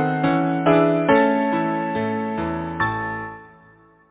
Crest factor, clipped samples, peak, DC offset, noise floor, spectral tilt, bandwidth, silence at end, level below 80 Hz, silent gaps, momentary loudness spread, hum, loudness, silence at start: 18 dB; under 0.1%; -4 dBFS; under 0.1%; -52 dBFS; -11 dB/octave; 4 kHz; 0.65 s; -48 dBFS; none; 10 LU; none; -20 LUFS; 0 s